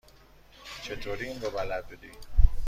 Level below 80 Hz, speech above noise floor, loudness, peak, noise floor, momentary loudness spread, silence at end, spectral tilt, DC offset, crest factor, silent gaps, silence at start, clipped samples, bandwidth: -30 dBFS; 21 dB; -34 LUFS; -4 dBFS; -55 dBFS; 19 LU; 0 s; -5.5 dB/octave; under 0.1%; 22 dB; none; 0.65 s; under 0.1%; 9.2 kHz